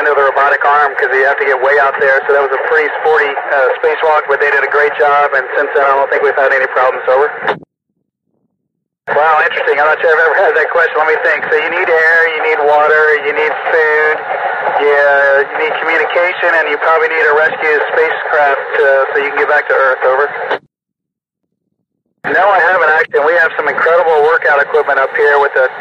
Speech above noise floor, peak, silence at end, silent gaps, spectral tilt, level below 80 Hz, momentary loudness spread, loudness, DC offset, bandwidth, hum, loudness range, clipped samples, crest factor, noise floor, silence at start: 69 dB; 0 dBFS; 0 s; none; -4 dB/octave; -60 dBFS; 4 LU; -10 LUFS; under 0.1%; 7.6 kHz; none; 4 LU; under 0.1%; 12 dB; -80 dBFS; 0 s